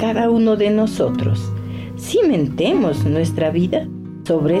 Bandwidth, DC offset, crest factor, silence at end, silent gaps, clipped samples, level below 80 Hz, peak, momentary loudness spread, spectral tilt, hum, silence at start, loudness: 14.5 kHz; under 0.1%; 8 dB; 0 s; none; under 0.1%; -46 dBFS; -8 dBFS; 12 LU; -7 dB/octave; none; 0 s; -18 LUFS